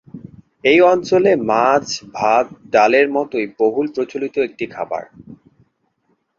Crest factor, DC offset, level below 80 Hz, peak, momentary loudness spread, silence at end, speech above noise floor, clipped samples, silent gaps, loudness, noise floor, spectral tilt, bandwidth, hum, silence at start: 16 dB; under 0.1%; -58 dBFS; 0 dBFS; 12 LU; 1.05 s; 50 dB; under 0.1%; none; -16 LUFS; -66 dBFS; -4.5 dB/octave; 7.6 kHz; none; 0.15 s